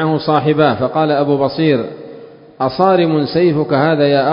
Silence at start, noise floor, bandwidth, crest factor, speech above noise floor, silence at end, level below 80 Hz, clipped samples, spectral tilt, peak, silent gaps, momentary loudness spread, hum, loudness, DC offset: 0 s; -36 dBFS; 5.4 kHz; 14 dB; 23 dB; 0 s; -52 dBFS; under 0.1%; -10 dB/octave; 0 dBFS; none; 8 LU; none; -14 LUFS; under 0.1%